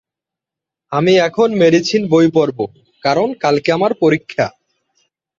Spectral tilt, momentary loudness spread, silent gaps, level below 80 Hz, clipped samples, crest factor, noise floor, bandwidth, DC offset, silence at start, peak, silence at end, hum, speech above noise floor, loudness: -6 dB/octave; 10 LU; none; -58 dBFS; under 0.1%; 14 dB; -85 dBFS; 7.6 kHz; under 0.1%; 0.9 s; -2 dBFS; 0.9 s; none; 72 dB; -15 LUFS